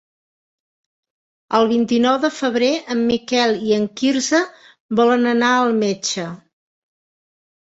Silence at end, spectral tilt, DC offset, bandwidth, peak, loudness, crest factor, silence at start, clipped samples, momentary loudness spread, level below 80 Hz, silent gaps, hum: 1.35 s; -3.5 dB/octave; under 0.1%; 8 kHz; -2 dBFS; -18 LUFS; 16 dB; 1.5 s; under 0.1%; 7 LU; -60 dBFS; 4.80-4.89 s; none